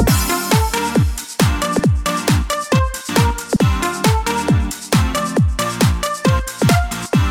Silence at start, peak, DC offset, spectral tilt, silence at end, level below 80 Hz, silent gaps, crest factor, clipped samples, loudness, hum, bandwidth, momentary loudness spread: 0 s; 0 dBFS; under 0.1%; -5 dB/octave; 0 s; -24 dBFS; none; 16 dB; under 0.1%; -17 LUFS; none; over 20 kHz; 2 LU